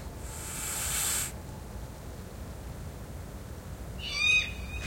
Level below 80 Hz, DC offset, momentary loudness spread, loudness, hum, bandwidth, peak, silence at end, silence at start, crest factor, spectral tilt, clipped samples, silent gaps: -44 dBFS; under 0.1%; 19 LU; -29 LUFS; none; 16.5 kHz; -14 dBFS; 0 s; 0 s; 20 dB; -1.5 dB/octave; under 0.1%; none